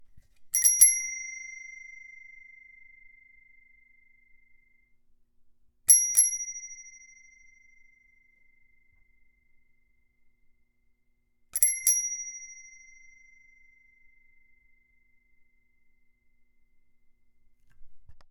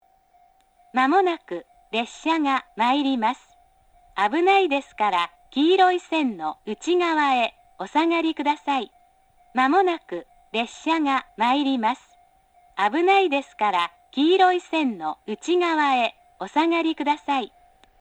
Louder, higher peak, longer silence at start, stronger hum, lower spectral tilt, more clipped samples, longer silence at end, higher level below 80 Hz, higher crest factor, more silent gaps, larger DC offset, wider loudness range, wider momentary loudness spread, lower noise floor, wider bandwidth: about the same, -22 LUFS vs -22 LUFS; about the same, -4 dBFS vs -6 dBFS; second, 0 s vs 0.95 s; neither; second, 4 dB/octave vs -3.5 dB/octave; neither; second, 0.1 s vs 0.55 s; about the same, -66 dBFS vs -66 dBFS; first, 30 dB vs 16 dB; neither; neither; first, 18 LU vs 3 LU; first, 28 LU vs 12 LU; first, -69 dBFS vs -59 dBFS; first, 18 kHz vs 9.6 kHz